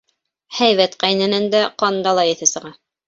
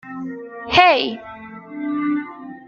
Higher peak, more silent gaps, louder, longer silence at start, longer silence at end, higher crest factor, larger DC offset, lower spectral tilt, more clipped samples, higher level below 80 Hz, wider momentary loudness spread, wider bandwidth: about the same, -2 dBFS vs -2 dBFS; neither; about the same, -16 LUFS vs -18 LUFS; first, 0.5 s vs 0.05 s; first, 0.35 s vs 0 s; about the same, 18 dB vs 20 dB; neither; second, -2.5 dB/octave vs -4.5 dB/octave; neither; second, -64 dBFS vs -54 dBFS; second, 4 LU vs 22 LU; first, 8 kHz vs 7.2 kHz